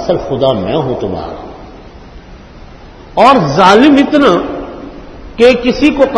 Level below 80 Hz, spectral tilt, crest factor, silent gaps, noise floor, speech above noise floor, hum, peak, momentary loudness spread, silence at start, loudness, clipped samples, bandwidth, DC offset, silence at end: -34 dBFS; -6 dB/octave; 12 dB; none; -33 dBFS; 24 dB; none; 0 dBFS; 21 LU; 0 s; -9 LUFS; 1%; 11 kHz; under 0.1%; 0 s